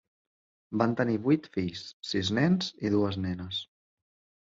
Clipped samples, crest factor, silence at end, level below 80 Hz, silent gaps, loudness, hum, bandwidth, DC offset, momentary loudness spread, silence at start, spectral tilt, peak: under 0.1%; 20 dB; 0.75 s; -54 dBFS; 1.93-2.00 s; -29 LUFS; none; 7.8 kHz; under 0.1%; 10 LU; 0.7 s; -6 dB/octave; -10 dBFS